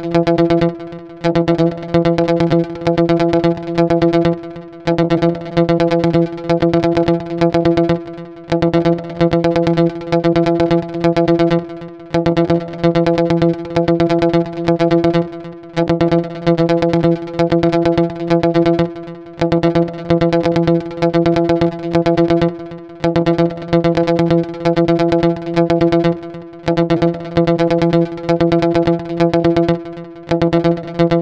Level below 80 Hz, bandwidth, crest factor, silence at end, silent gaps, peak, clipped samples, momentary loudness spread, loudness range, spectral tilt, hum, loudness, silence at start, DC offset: -40 dBFS; 7.4 kHz; 14 dB; 0 s; none; 0 dBFS; under 0.1%; 6 LU; 1 LU; -8 dB/octave; none; -15 LUFS; 0 s; under 0.1%